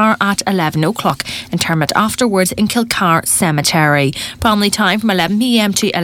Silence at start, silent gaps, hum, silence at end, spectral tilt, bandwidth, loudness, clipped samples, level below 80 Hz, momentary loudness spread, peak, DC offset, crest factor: 0 s; none; none; 0 s; -4 dB/octave; 19 kHz; -14 LUFS; under 0.1%; -42 dBFS; 5 LU; 0 dBFS; under 0.1%; 14 dB